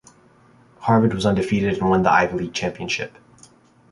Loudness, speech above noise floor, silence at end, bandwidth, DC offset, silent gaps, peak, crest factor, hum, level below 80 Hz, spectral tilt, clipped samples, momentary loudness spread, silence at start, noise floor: -20 LUFS; 34 dB; 0.8 s; 11.5 kHz; under 0.1%; none; -2 dBFS; 18 dB; none; -48 dBFS; -6 dB/octave; under 0.1%; 9 LU; 0.8 s; -53 dBFS